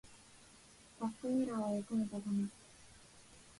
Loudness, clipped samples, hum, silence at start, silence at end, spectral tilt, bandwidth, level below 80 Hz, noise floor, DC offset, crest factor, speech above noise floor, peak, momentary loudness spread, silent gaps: -39 LUFS; under 0.1%; none; 0.05 s; 0.05 s; -6.5 dB/octave; 11.5 kHz; -72 dBFS; -62 dBFS; under 0.1%; 14 dB; 24 dB; -26 dBFS; 23 LU; none